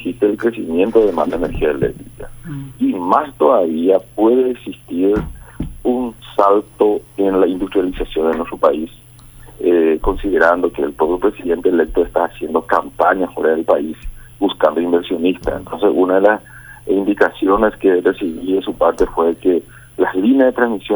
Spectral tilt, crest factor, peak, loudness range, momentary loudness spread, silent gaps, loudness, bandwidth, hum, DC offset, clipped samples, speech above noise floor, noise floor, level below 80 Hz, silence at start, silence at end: -6.5 dB/octave; 16 dB; 0 dBFS; 2 LU; 9 LU; none; -16 LUFS; over 20 kHz; none; under 0.1%; under 0.1%; 25 dB; -40 dBFS; -36 dBFS; 0 s; 0 s